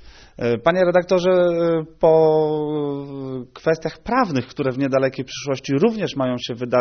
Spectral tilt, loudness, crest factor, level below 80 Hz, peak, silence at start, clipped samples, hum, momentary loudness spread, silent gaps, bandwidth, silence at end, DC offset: -5.5 dB/octave; -20 LUFS; 16 dB; -52 dBFS; -2 dBFS; 0 s; under 0.1%; none; 10 LU; none; 6.6 kHz; 0 s; under 0.1%